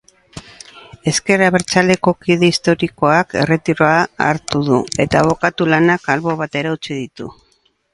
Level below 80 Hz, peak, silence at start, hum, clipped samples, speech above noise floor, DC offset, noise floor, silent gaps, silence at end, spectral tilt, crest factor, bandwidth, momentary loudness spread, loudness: -46 dBFS; 0 dBFS; 0.35 s; none; under 0.1%; 44 dB; under 0.1%; -59 dBFS; none; 0.6 s; -5 dB/octave; 16 dB; 11.5 kHz; 11 LU; -15 LUFS